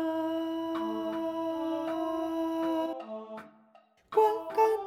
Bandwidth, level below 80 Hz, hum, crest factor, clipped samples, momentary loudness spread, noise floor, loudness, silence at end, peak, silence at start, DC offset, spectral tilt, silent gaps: 15.5 kHz; -72 dBFS; none; 18 dB; under 0.1%; 13 LU; -62 dBFS; -31 LUFS; 0 s; -12 dBFS; 0 s; under 0.1%; -5.5 dB/octave; none